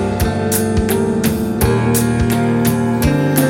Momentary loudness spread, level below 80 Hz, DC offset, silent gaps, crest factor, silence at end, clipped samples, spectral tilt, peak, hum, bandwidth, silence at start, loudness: 2 LU; -28 dBFS; under 0.1%; none; 14 dB; 0 s; under 0.1%; -6 dB/octave; 0 dBFS; none; 17 kHz; 0 s; -15 LUFS